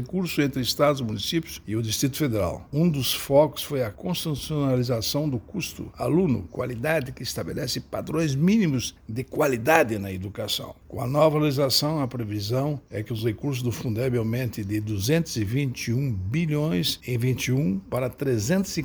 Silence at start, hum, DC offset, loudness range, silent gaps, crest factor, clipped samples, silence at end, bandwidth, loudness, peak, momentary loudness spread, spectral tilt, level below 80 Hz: 0 s; none; under 0.1%; 3 LU; none; 22 dB; under 0.1%; 0 s; over 20 kHz; -25 LUFS; -2 dBFS; 9 LU; -5.5 dB/octave; -50 dBFS